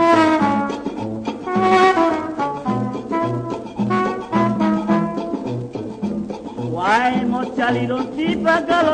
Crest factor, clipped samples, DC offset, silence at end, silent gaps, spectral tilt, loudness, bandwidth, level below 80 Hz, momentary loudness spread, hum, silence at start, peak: 18 dB; under 0.1%; under 0.1%; 0 s; none; -6.5 dB/octave; -19 LUFS; 9.6 kHz; -50 dBFS; 12 LU; none; 0 s; 0 dBFS